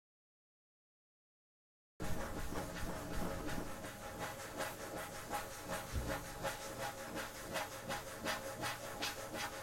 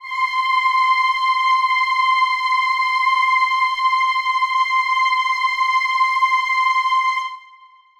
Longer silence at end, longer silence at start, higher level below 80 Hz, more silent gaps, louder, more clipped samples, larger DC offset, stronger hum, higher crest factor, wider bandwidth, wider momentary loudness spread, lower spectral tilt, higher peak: second, 0 s vs 0.6 s; first, 2 s vs 0 s; first, -54 dBFS vs -66 dBFS; neither; second, -44 LUFS vs -17 LUFS; neither; neither; neither; first, 18 dB vs 12 dB; first, 16.5 kHz vs 12 kHz; about the same, 4 LU vs 3 LU; first, -3.5 dB/octave vs 5 dB/octave; second, -26 dBFS vs -6 dBFS